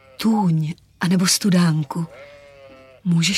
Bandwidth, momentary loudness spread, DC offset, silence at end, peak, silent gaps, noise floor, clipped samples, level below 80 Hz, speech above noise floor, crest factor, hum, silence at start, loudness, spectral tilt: 15 kHz; 13 LU; under 0.1%; 0 s; -6 dBFS; none; -45 dBFS; under 0.1%; -60 dBFS; 27 dB; 14 dB; none; 0.2 s; -20 LUFS; -4.5 dB/octave